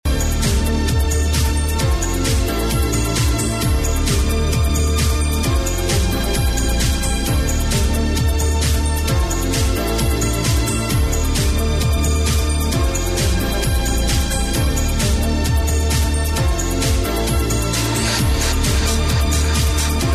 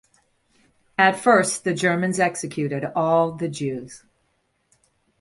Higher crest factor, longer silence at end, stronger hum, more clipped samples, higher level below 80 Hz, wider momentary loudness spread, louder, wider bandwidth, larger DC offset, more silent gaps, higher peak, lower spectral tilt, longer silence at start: second, 10 dB vs 22 dB; second, 0 s vs 1.25 s; neither; neither; first, -20 dBFS vs -64 dBFS; second, 2 LU vs 11 LU; first, -18 LUFS vs -21 LUFS; first, 14.5 kHz vs 11.5 kHz; neither; neither; second, -6 dBFS vs -2 dBFS; about the same, -4.5 dB/octave vs -4.5 dB/octave; second, 0.05 s vs 1 s